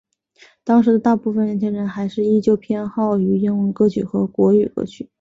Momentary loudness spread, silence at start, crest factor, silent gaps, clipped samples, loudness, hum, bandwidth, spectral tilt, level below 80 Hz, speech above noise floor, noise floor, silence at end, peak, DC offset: 8 LU; 0.65 s; 14 dB; none; under 0.1%; -18 LUFS; none; 7.6 kHz; -9 dB/octave; -56 dBFS; 35 dB; -52 dBFS; 0.15 s; -4 dBFS; under 0.1%